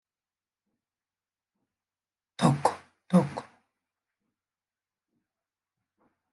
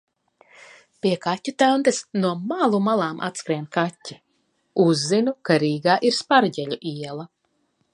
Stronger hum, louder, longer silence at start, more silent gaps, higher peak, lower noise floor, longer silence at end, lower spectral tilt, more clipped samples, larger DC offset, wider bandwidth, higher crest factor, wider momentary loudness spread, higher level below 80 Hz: neither; second, -27 LUFS vs -22 LUFS; first, 2.4 s vs 1.05 s; neither; second, -8 dBFS vs -4 dBFS; first, under -90 dBFS vs -69 dBFS; first, 2.9 s vs 0.65 s; first, -7 dB/octave vs -5 dB/octave; neither; neither; about the same, 11.5 kHz vs 11.5 kHz; first, 26 dB vs 20 dB; first, 19 LU vs 12 LU; about the same, -76 dBFS vs -74 dBFS